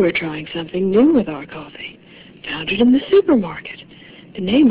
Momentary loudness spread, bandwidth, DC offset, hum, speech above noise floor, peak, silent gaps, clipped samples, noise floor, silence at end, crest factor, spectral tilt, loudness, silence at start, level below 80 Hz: 19 LU; 4 kHz; under 0.1%; none; 25 dB; -2 dBFS; none; under 0.1%; -42 dBFS; 0 s; 16 dB; -10.5 dB/octave; -17 LUFS; 0 s; -50 dBFS